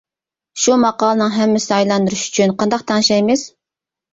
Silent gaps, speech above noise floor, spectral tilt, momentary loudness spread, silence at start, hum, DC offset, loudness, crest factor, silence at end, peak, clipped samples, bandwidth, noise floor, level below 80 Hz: none; 73 dB; -4 dB/octave; 5 LU; 0.55 s; none; under 0.1%; -15 LUFS; 14 dB; 0.65 s; -2 dBFS; under 0.1%; 8 kHz; -88 dBFS; -56 dBFS